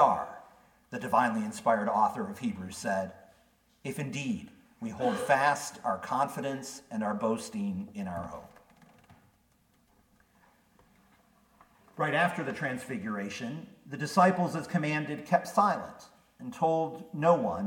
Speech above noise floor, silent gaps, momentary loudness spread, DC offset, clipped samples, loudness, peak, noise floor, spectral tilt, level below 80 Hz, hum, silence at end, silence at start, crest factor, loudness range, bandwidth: 38 dB; none; 16 LU; under 0.1%; under 0.1%; -31 LUFS; -8 dBFS; -68 dBFS; -5.5 dB/octave; -68 dBFS; none; 0 s; 0 s; 24 dB; 8 LU; 18 kHz